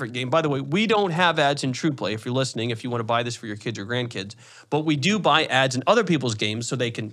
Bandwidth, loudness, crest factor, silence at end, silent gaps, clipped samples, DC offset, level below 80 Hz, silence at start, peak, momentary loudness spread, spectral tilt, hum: 13 kHz; -23 LUFS; 20 dB; 0 s; none; under 0.1%; under 0.1%; -74 dBFS; 0 s; -4 dBFS; 10 LU; -4.5 dB/octave; none